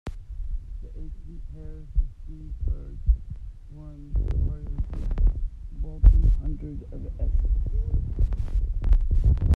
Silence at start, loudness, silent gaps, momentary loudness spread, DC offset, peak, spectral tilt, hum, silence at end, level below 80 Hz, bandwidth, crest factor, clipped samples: 0.05 s; -28 LUFS; none; 18 LU; under 0.1%; -2 dBFS; -9.5 dB/octave; none; 0 s; -24 dBFS; 2.3 kHz; 22 dB; under 0.1%